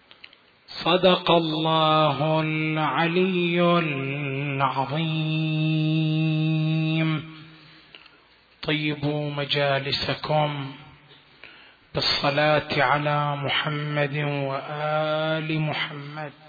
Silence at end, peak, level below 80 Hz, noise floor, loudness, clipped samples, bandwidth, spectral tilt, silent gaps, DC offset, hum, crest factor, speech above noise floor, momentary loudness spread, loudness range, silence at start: 0.15 s; -6 dBFS; -60 dBFS; -56 dBFS; -23 LUFS; under 0.1%; 5 kHz; -7.5 dB/octave; none; under 0.1%; none; 18 dB; 33 dB; 8 LU; 5 LU; 0.7 s